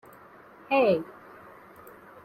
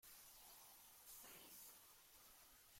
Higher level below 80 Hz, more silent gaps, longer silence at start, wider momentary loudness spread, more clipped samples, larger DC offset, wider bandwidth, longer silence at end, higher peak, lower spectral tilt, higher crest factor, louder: first, -70 dBFS vs -84 dBFS; neither; first, 0.7 s vs 0 s; first, 26 LU vs 6 LU; neither; neither; about the same, 16 kHz vs 16.5 kHz; first, 1.15 s vs 0 s; first, -12 dBFS vs -48 dBFS; first, -7 dB/octave vs -0.5 dB/octave; about the same, 18 dB vs 16 dB; first, -25 LUFS vs -61 LUFS